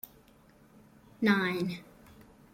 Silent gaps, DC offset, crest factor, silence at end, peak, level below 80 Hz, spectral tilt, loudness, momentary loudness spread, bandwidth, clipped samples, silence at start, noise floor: none; under 0.1%; 20 dB; 0.3 s; -14 dBFS; -68 dBFS; -6 dB/octave; -30 LUFS; 18 LU; 16.5 kHz; under 0.1%; 1.2 s; -60 dBFS